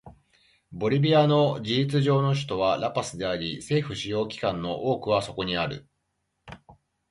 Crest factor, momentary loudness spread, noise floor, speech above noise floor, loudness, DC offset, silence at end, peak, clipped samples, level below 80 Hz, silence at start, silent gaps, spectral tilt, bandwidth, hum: 16 dB; 9 LU; -77 dBFS; 52 dB; -25 LUFS; under 0.1%; 0.4 s; -10 dBFS; under 0.1%; -56 dBFS; 0.05 s; none; -6 dB/octave; 11.5 kHz; none